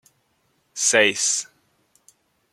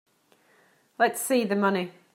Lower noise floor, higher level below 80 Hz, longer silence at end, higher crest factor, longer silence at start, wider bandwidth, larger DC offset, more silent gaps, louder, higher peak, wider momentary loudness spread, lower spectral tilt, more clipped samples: first, -67 dBFS vs -63 dBFS; first, -74 dBFS vs -82 dBFS; first, 1.1 s vs 0.25 s; about the same, 24 dB vs 20 dB; second, 0.75 s vs 1 s; about the same, 16 kHz vs 16 kHz; neither; neither; first, -19 LUFS vs -25 LUFS; first, -2 dBFS vs -8 dBFS; first, 21 LU vs 3 LU; second, 0 dB/octave vs -4.5 dB/octave; neither